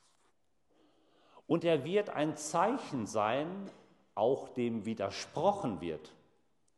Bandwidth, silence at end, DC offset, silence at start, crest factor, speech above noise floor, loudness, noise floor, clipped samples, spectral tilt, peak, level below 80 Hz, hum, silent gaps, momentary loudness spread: 12 kHz; 0.65 s; under 0.1%; 1.35 s; 20 dB; 43 dB; -34 LUFS; -76 dBFS; under 0.1%; -5.5 dB/octave; -16 dBFS; -74 dBFS; none; none; 11 LU